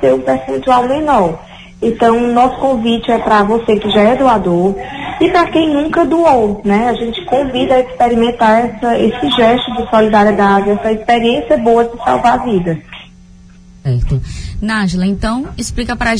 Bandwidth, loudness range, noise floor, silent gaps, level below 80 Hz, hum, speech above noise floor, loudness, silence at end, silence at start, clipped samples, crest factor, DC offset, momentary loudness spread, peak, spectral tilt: 10.5 kHz; 5 LU; -39 dBFS; none; -30 dBFS; none; 27 dB; -12 LUFS; 0 s; 0 s; under 0.1%; 12 dB; under 0.1%; 9 LU; 0 dBFS; -6 dB/octave